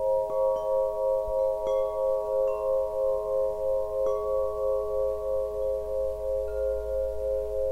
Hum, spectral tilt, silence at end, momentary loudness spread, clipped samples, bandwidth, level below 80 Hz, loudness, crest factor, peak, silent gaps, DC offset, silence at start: none; -6.5 dB/octave; 0 s; 3 LU; under 0.1%; 15 kHz; -46 dBFS; -28 LUFS; 10 dB; -16 dBFS; none; 0.3%; 0 s